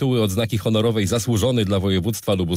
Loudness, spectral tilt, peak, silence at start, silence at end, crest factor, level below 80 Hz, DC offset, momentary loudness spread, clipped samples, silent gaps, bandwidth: -20 LUFS; -5.5 dB/octave; -10 dBFS; 0 s; 0 s; 10 dB; -50 dBFS; under 0.1%; 3 LU; under 0.1%; none; 16 kHz